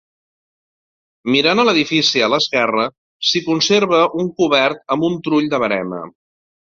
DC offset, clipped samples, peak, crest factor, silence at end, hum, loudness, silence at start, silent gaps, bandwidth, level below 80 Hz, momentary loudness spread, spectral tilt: under 0.1%; under 0.1%; 0 dBFS; 16 dB; 0.65 s; none; -16 LUFS; 1.25 s; 2.98-3.20 s; 7.6 kHz; -60 dBFS; 8 LU; -4 dB/octave